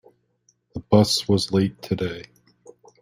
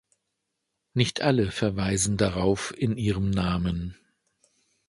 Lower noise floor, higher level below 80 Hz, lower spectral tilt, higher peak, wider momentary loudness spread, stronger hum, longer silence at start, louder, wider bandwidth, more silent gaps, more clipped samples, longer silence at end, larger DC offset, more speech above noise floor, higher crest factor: second, -66 dBFS vs -81 dBFS; second, -54 dBFS vs -44 dBFS; about the same, -5.5 dB/octave vs -5 dB/octave; about the same, -4 dBFS vs -6 dBFS; first, 21 LU vs 6 LU; first, 60 Hz at -45 dBFS vs none; second, 0.75 s vs 0.95 s; first, -21 LUFS vs -26 LUFS; first, 16 kHz vs 11.5 kHz; neither; neither; second, 0.8 s vs 0.95 s; neither; second, 45 dB vs 56 dB; about the same, 20 dB vs 22 dB